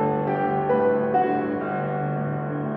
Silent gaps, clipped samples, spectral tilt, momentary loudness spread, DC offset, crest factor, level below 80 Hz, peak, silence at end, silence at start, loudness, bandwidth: none; under 0.1%; -11.5 dB/octave; 6 LU; under 0.1%; 14 dB; -58 dBFS; -10 dBFS; 0 s; 0 s; -24 LUFS; 4.5 kHz